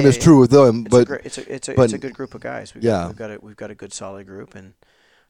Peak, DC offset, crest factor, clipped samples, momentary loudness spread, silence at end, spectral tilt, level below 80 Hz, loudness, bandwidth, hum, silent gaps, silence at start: 0 dBFS; under 0.1%; 18 dB; under 0.1%; 24 LU; 0.7 s; -6.5 dB/octave; -46 dBFS; -15 LUFS; 15.5 kHz; none; none; 0 s